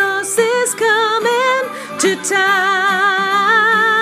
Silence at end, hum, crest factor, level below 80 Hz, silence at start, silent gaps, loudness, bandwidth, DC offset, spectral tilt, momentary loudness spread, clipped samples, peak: 0 s; none; 12 dB; -78 dBFS; 0 s; none; -14 LUFS; 15.5 kHz; under 0.1%; -1.5 dB/octave; 5 LU; under 0.1%; -2 dBFS